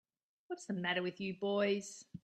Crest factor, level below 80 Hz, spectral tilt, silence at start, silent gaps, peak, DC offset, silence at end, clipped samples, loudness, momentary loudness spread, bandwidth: 18 dB; -80 dBFS; -4.5 dB/octave; 0.5 s; none; -20 dBFS; under 0.1%; 0.05 s; under 0.1%; -37 LUFS; 13 LU; 11.5 kHz